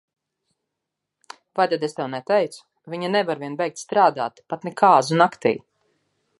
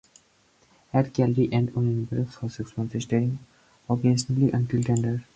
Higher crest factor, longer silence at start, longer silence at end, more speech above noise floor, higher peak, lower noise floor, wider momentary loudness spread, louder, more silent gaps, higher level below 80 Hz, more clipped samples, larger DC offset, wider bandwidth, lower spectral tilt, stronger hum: about the same, 22 dB vs 18 dB; first, 1.55 s vs 0.95 s; first, 0.8 s vs 0.15 s; first, 61 dB vs 38 dB; first, -2 dBFS vs -8 dBFS; first, -83 dBFS vs -62 dBFS; first, 14 LU vs 9 LU; first, -21 LUFS vs -25 LUFS; neither; second, -74 dBFS vs -56 dBFS; neither; neither; first, 11.5 kHz vs 9.2 kHz; second, -5 dB/octave vs -7.5 dB/octave; neither